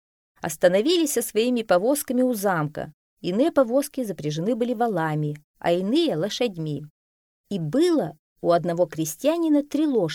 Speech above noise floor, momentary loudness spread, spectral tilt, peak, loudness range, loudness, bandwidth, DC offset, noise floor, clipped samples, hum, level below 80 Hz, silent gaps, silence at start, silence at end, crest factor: over 67 dB; 11 LU; -5 dB/octave; -4 dBFS; 3 LU; -23 LUFS; 18 kHz; under 0.1%; under -90 dBFS; under 0.1%; none; -64 dBFS; 2.94-3.17 s, 5.44-5.54 s, 6.90-7.44 s, 8.19-8.36 s; 0.45 s; 0 s; 20 dB